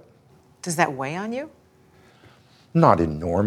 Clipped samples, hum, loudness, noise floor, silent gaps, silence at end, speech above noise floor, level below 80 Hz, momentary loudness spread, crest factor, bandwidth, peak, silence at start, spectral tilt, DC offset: under 0.1%; none; -22 LUFS; -55 dBFS; none; 0 s; 34 dB; -48 dBFS; 16 LU; 24 dB; 14.5 kHz; -2 dBFS; 0.65 s; -6 dB/octave; under 0.1%